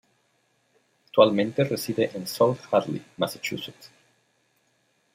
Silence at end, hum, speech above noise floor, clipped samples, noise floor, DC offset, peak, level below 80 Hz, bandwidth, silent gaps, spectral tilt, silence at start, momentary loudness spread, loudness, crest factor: 1.3 s; none; 45 dB; under 0.1%; -69 dBFS; under 0.1%; -4 dBFS; -70 dBFS; 16 kHz; none; -5.5 dB/octave; 1.15 s; 12 LU; -25 LUFS; 24 dB